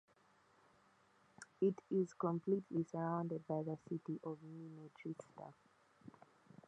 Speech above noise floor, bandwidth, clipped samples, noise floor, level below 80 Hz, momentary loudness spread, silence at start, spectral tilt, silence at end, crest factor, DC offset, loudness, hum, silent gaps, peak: 31 dB; 10 kHz; under 0.1%; -73 dBFS; -86 dBFS; 21 LU; 1.4 s; -9 dB/octave; 0.6 s; 20 dB; under 0.1%; -42 LUFS; none; none; -26 dBFS